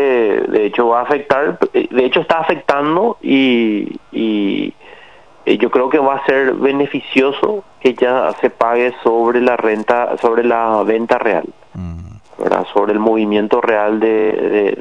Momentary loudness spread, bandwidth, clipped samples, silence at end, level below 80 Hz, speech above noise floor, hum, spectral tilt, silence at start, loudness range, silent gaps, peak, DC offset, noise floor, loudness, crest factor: 6 LU; 9.2 kHz; under 0.1%; 0 s; -52 dBFS; 29 dB; none; -6.5 dB/octave; 0 s; 2 LU; none; 0 dBFS; 0.4%; -43 dBFS; -15 LUFS; 14 dB